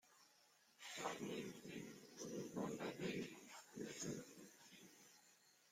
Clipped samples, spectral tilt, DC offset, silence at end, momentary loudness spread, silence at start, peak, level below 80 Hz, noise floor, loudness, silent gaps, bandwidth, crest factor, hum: under 0.1%; -4 dB/octave; under 0.1%; 0 s; 18 LU; 0.05 s; -32 dBFS; -84 dBFS; -74 dBFS; -51 LUFS; none; 16.5 kHz; 20 dB; none